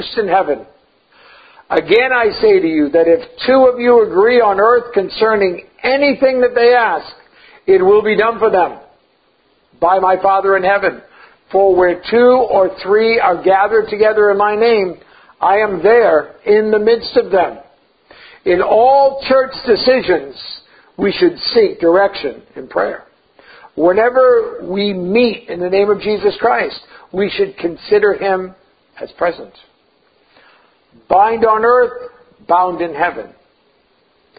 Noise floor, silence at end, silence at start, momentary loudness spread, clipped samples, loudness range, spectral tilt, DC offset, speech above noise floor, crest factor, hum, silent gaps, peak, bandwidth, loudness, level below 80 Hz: -56 dBFS; 1.1 s; 0 s; 10 LU; under 0.1%; 5 LU; -8.5 dB/octave; under 0.1%; 44 dB; 14 dB; none; none; 0 dBFS; 5 kHz; -13 LUFS; -50 dBFS